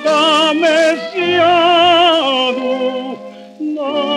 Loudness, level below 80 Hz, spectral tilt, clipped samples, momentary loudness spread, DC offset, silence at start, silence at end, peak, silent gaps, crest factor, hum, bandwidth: -12 LUFS; -62 dBFS; -3 dB/octave; under 0.1%; 14 LU; under 0.1%; 0 s; 0 s; -2 dBFS; none; 12 dB; none; 11.5 kHz